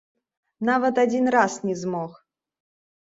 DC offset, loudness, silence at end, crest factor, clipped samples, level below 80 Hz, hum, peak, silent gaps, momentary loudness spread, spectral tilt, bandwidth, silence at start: under 0.1%; -23 LUFS; 0.95 s; 20 dB; under 0.1%; -70 dBFS; none; -6 dBFS; none; 10 LU; -5.5 dB/octave; 7.8 kHz; 0.6 s